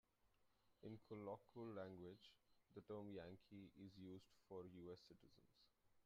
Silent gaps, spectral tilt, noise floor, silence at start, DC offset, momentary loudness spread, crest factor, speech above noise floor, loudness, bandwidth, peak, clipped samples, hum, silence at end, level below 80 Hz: none; -6.5 dB/octave; -82 dBFS; 0.25 s; under 0.1%; 9 LU; 18 dB; 23 dB; -59 LUFS; 7.4 kHz; -42 dBFS; under 0.1%; none; 0.05 s; -86 dBFS